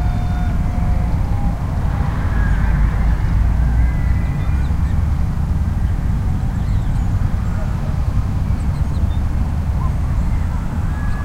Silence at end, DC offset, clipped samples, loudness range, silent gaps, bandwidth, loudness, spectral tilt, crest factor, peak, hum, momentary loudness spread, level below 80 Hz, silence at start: 0 s; under 0.1%; under 0.1%; 2 LU; none; 9.6 kHz; -20 LUFS; -8 dB/octave; 12 dB; -4 dBFS; none; 3 LU; -18 dBFS; 0 s